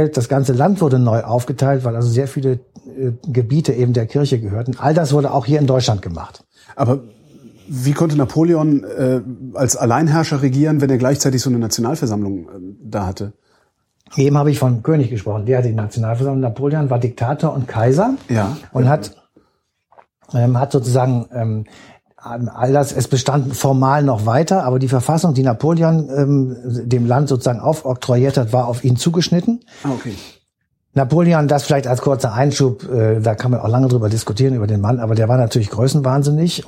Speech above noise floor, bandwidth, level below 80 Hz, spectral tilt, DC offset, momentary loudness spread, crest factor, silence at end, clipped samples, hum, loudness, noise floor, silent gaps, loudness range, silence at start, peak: 54 dB; 15.5 kHz; -50 dBFS; -6.5 dB/octave; under 0.1%; 9 LU; 14 dB; 0.05 s; under 0.1%; none; -16 LUFS; -69 dBFS; none; 3 LU; 0 s; -2 dBFS